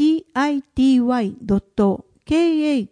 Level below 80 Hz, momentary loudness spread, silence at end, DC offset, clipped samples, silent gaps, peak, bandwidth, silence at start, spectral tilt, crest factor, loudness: -44 dBFS; 6 LU; 0.05 s; under 0.1%; under 0.1%; none; -6 dBFS; 10 kHz; 0 s; -6.5 dB/octave; 12 dB; -19 LUFS